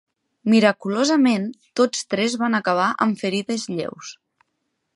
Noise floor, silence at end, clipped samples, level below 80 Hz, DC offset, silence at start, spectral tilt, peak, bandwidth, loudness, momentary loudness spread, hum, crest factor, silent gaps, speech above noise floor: -75 dBFS; 0.85 s; under 0.1%; -72 dBFS; under 0.1%; 0.45 s; -4.5 dB/octave; -2 dBFS; 11.5 kHz; -21 LUFS; 12 LU; none; 18 dB; none; 55 dB